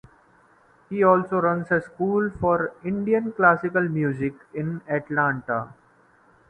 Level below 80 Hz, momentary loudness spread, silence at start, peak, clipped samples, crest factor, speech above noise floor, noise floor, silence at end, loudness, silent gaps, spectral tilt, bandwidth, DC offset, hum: -56 dBFS; 11 LU; 0.9 s; -2 dBFS; under 0.1%; 22 dB; 35 dB; -58 dBFS; 0.8 s; -23 LUFS; none; -10 dB/octave; 9.2 kHz; under 0.1%; none